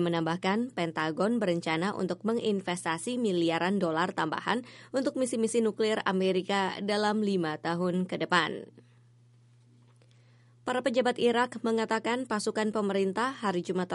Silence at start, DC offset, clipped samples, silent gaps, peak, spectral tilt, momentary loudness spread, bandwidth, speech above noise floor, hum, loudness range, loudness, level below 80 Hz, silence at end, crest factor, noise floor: 0 s; under 0.1%; under 0.1%; none; -10 dBFS; -5 dB/octave; 4 LU; 11.5 kHz; 31 dB; none; 4 LU; -29 LUFS; -76 dBFS; 0 s; 20 dB; -60 dBFS